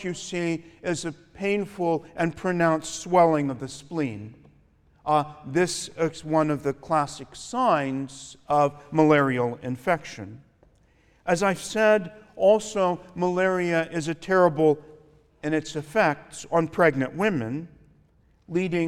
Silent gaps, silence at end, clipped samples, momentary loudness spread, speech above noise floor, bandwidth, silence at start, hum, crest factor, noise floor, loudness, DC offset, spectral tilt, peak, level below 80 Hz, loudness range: none; 0 s; under 0.1%; 12 LU; 36 dB; 14.5 kHz; 0 s; none; 20 dB; -60 dBFS; -25 LUFS; under 0.1%; -5.5 dB/octave; -6 dBFS; -60 dBFS; 3 LU